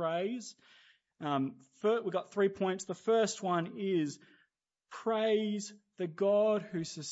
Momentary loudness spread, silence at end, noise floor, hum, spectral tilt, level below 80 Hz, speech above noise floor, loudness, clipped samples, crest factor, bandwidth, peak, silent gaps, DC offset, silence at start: 11 LU; 0 s; -78 dBFS; none; -5 dB/octave; -80 dBFS; 45 dB; -33 LUFS; under 0.1%; 16 dB; 8 kHz; -18 dBFS; none; under 0.1%; 0 s